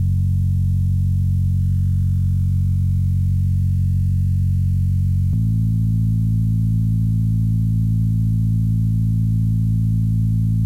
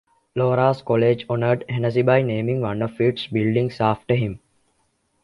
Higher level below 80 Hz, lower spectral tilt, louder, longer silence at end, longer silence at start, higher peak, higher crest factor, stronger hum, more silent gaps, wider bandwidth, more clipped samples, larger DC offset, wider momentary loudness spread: first, -28 dBFS vs -54 dBFS; about the same, -10 dB/octave vs -9 dB/octave; about the same, -19 LUFS vs -21 LUFS; second, 0 s vs 0.85 s; second, 0 s vs 0.35 s; second, -12 dBFS vs -4 dBFS; second, 6 dB vs 16 dB; neither; neither; second, 0.7 kHz vs 6 kHz; neither; neither; second, 0 LU vs 5 LU